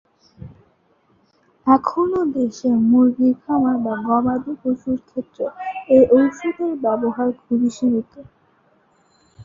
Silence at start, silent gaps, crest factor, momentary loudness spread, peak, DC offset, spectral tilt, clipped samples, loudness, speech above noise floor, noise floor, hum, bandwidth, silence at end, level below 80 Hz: 0.4 s; none; 18 dB; 12 LU; -2 dBFS; under 0.1%; -7.5 dB/octave; under 0.1%; -19 LUFS; 42 dB; -60 dBFS; none; 7.6 kHz; 0 s; -56 dBFS